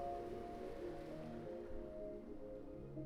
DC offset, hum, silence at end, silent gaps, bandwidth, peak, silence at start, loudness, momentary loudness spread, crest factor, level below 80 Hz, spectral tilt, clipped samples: under 0.1%; none; 0 s; none; 14 kHz; -34 dBFS; 0 s; -50 LUFS; 5 LU; 14 dB; -58 dBFS; -8 dB/octave; under 0.1%